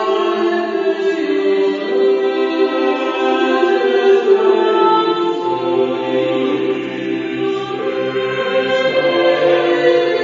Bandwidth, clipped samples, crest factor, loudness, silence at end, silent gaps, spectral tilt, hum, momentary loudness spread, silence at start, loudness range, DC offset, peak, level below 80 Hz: 7.4 kHz; under 0.1%; 14 dB; -15 LUFS; 0 s; none; -5.5 dB/octave; none; 7 LU; 0 s; 4 LU; under 0.1%; 0 dBFS; -64 dBFS